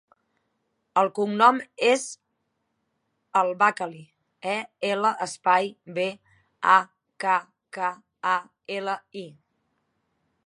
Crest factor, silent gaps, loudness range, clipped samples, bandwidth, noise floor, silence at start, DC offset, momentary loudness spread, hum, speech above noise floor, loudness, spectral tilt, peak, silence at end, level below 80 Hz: 24 dB; none; 4 LU; under 0.1%; 11.5 kHz; -76 dBFS; 0.95 s; under 0.1%; 16 LU; none; 52 dB; -24 LUFS; -3.5 dB/octave; -4 dBFS; 1.15 s; -82 dBFS